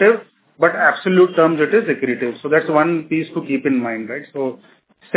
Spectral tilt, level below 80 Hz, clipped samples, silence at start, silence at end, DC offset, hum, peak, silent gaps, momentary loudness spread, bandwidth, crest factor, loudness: -10 dB/octave; -72 dBFS; under 0.1%; 0 s; 0 s; under 0.1%; none; 0 dBFS; none; 11 LU; 4 kHz; 16 dB; -17 LUFS